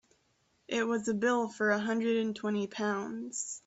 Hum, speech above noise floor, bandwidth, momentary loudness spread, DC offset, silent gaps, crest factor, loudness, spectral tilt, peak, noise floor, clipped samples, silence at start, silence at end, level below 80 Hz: none; 41 dB; 8.2 kHz; 7 LU; under 0.1%; none; 18 dB; -32 LUFS; -4 dB/octave; -16 dBFS; -73 dBFS; under 0.1%; 0.7 s; 0.1 s; -76 dBFS